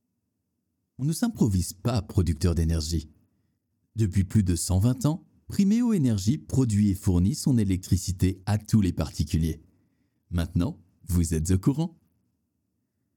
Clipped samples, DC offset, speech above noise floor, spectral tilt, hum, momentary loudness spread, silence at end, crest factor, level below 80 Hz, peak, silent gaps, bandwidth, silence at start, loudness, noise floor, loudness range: under 0.1%; under 0.1%; 54 dB; -6.5 dB/octave; none; 8 LU; 1.25 s; 16 dB; -40 dBFS; -10 dBFS; none; 18 kHz; 1 s; -26 LUFS; -78 dBFS; 4 LU